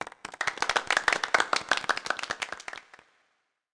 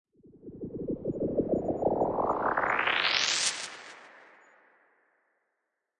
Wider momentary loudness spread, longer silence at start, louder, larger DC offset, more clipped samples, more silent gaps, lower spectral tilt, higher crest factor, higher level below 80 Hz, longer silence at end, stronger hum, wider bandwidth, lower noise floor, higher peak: second, 15 LU vs 19 LU; second, 0 s vs 0.45 s; about the same, -28 LUFS vs -28 LUFS; neither; neither; neither; second, 0 dB/octave vs -2.5 dB/octave; about the same, 20 dB vs 18 dB; second, -66 dBFS vs -58 dBFS; second, 0.9 s vs 1.75 s; neither; about the same, 10.5 kHz vs 11 kHz; second, -75 dBFS vs -82 dBFS; first, -10 dBFS vs -14 dBFS